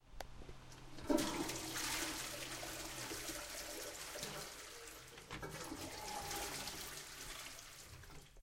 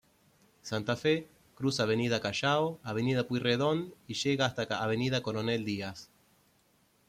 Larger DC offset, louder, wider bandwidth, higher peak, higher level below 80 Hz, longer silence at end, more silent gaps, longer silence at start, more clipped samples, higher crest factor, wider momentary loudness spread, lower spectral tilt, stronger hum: neither; second, -45 LUFS vs -31 LUFS; about the same, 16 kHz vs 15.5 kHz; second, -20 dBFS vs -14 dBFS; first, -60 dBFS vs -68 dBFS; second, 0 s vs 1.05 s; neither; second, 0.05 s vs 0.65 s; neither; first, 26 dB vs 18 dB; first, 15 LU vs 8 LU; second, -2.5 dB/octave vs -5 dB/octave; neither